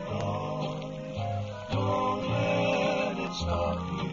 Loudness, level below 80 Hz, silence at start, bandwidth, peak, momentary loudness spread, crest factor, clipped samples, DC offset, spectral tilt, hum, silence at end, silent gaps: -30 LUFS; -48 dBFS; 0 s; 7.6 kHz; -16 dBFS; 8 LU; 14 dB; under 0.1%; under 0.1%; -6 dB/octave; none; 0 s; none